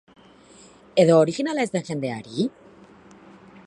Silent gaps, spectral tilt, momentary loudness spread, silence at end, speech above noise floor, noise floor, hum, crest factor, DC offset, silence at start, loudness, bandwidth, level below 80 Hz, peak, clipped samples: none; -6 dB/octave; 12 LU; 1.15 s; 29 dB; -50 dBFS; none; 20 dB; under 0.1%; 0.95 s; -22 LUFS; 11.5 kHz; -66 dBFS; -4 dBFS; under 0.1%